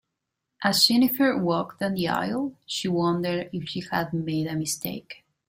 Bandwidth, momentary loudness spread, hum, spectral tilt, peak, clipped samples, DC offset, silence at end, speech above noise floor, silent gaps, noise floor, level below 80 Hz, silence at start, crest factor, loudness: 16 kHz; 12 LU; none; -4 dB/octave; -6 dBFS; under 0.1%; under 0.1%; 0.35 s; 57 dB; none; -82 dBFS; -62 dBFS; 0.6 s; 20 dB; -25 LUFS